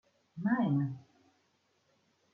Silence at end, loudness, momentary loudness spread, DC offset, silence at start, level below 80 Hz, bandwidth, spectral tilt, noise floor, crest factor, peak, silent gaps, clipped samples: 1.35 s; -33 LUFS; 20 LU; under 0.1%; 0.35 s; -78 dBFS; 5 kHz; -10 dB/octave; -75 dBFS; 18 dB; -18 dBFS; none; under 0.1%